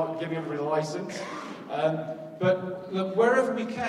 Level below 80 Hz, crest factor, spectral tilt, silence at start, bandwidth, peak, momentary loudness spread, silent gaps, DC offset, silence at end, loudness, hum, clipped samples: -72 dBFS; 18 dB; -6 dB/octave; 0 s; 12 kHz; -10 dBFS; 13 LU; none; under 0.1%; 0 s; -28 LUFS; none; under 0.1%